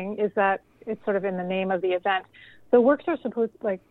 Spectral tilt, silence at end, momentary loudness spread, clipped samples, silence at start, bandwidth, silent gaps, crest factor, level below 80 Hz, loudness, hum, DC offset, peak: -8.5 dB/octave; 0.15 s; 10 LU; under 0.1%; 0 s; 4.1 kHz; none; 18 dB; -68 dBFS; -25 LUFS; none; under 0.1%; -6 dBFS